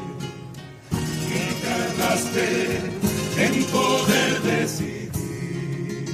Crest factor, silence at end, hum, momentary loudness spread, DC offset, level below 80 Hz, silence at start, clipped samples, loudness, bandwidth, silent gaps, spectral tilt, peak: 18 dB; 0 s; none; 12 LU; under 0.1%; -50 dBFS; 0 s; under 0.1%; -23 LUFS; 15.5 kHz; none; -4.5 dB/octave; -6 dBFS